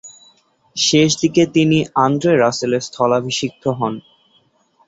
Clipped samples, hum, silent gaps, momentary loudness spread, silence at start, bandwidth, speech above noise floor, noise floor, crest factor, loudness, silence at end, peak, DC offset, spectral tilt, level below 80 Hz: under 0.1%; none; none; 9 LU; 0.05 s; 8 kHz; 42 dB; -58 dBFS; 16 dB; -16 LUFS; 0.9 s; -2 dBFS; under 0.1%; -4.5 dB/octave; -56 dBFS